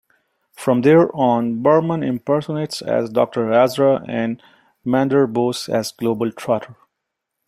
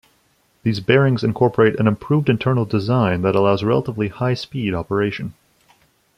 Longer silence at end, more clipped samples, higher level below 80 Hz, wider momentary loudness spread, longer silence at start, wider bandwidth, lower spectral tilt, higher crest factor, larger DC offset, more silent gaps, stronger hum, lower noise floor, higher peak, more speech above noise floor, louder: about the same, 0.75 s vs 0.85 s; neither; second, -62 dBFS vs -52 dBFS; about the same, 10 LU vs 8 LU; about the same, 0.6 s vs 0.65 s; first, 15.5 kHz vs 10 kHz; second, -6.5 dB/octave vs -8 dB/octave; about the same, 16 dB vs 16 dB; neither; neither; neither; first, -79 dBFS vs -61 dBFS; about the same, -2 dBFS vs -2 dBFS; first, 61 dB vs 43 dB; about the same, -18 LUFS vs -19 LUFS